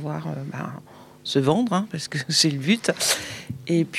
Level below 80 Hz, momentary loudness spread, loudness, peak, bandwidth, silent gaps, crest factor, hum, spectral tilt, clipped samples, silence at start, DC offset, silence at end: -64 dBFS; 15 LU; -23 LUFS; -6 dBFS; 16 kHz; none; 18 dB; none; -4 dB/octave; under 0.1%; 0 s; under 0.1%; 0 s